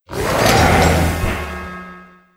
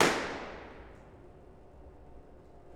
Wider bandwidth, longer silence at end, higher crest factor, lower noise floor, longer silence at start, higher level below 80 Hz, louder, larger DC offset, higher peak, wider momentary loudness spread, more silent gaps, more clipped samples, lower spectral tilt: about the same, 16.5 kHz vs 18 kHz; first, 0.3 s vs 0 s; second, 16 dB vs 28 dB; second, -40 dBFS vs -53 dBFS; about the same, 0.1 s vs 0 s; first, -26 dBFS vs -56 dBFS; first, -15 LUFS vs -35 LUFS; neither; first, 0 dBFS vs -8 dBFS; about the same, 19 LU vs 21 LU; neither; neither; first, -4.5 dB/octave vs -3 dB/octave